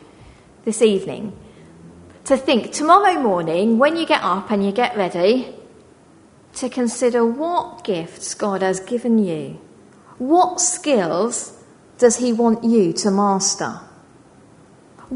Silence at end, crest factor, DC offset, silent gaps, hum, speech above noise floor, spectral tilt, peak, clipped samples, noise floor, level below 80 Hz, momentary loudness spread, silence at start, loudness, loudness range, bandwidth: 0 s; 18 dB; under 0.1%; none; none; 31 dB; -4 dB/octave; 0 dBFS; under 0.1%; -49 dBFS; -60 dBFS; 13 LU; 0.2 s; -18 LUFS; 5 LU; 11 kHz